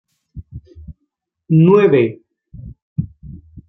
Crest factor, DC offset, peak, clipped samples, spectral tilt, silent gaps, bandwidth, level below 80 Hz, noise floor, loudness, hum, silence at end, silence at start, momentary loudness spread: 18 dB; under 0.1%; 0 dBFS; under 0.1%; -10.5 dB/octave; 2.82-2.96 s; 4 kHz; -44 dBFS; -72 dBFS; -14 LUFS; none; 0.1 s; 0.35 s; 27 LU